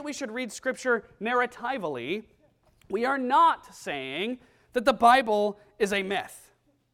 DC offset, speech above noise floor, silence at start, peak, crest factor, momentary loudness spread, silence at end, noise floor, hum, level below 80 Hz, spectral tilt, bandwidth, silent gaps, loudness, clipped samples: under 0.1%; 37 dB; 0 s; -8 dBFS; 20 dB; 13 LU; 0.55 s; -63 dBFS; none; -64 dBFS; -3.5 dB/octave; 16.5 kHz; none; -27 LUFS; under 0.1%